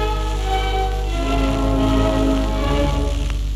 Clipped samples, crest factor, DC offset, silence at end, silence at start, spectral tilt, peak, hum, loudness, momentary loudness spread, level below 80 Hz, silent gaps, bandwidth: under 0.1%; 12 dB; under 0.1%; 0 s; 0 s; -6 dB/octave; -6 dBFS; 50 Hz at -20 dBFS; -20 LUFS; 5 LU; -20 dBFS; none; 12.5 kHz